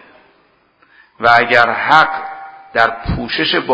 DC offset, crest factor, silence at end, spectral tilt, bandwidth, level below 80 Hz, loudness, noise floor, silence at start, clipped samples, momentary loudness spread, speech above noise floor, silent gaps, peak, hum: under 0.1%; 16 dB; 0 s; -5 dB/octave; 8 kHz; -38 dBFS; -13 LUFS; -55 dBFS; 1.2 s; 0.3%; 14 LU; 42 dB; none; 0 dBFS; none